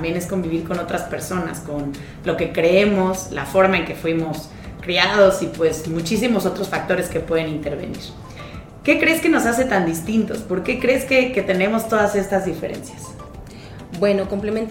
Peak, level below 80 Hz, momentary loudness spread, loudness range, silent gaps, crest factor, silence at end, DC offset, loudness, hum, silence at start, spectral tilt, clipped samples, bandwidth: 0 dBFS; -42 dBFS; 18 LU; 4 LU; none; 20 dB; 0 s; under 0.1%; -20 LUFS; none; 0 s; -5 dB/octave; under 0.1%; 17 kHz